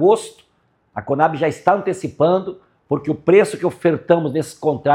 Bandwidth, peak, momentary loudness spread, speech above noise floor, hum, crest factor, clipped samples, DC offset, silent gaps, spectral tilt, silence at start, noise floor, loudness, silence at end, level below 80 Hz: 13.5 kHz; 0 dBFS; 10 LU; 45 dB; none; 18 dB; under 0.1%; under 0.1%; none; -6.5 dB/octave; 0 s; -62 dBFS; -18 LUFS; 0 s; -60 dBFS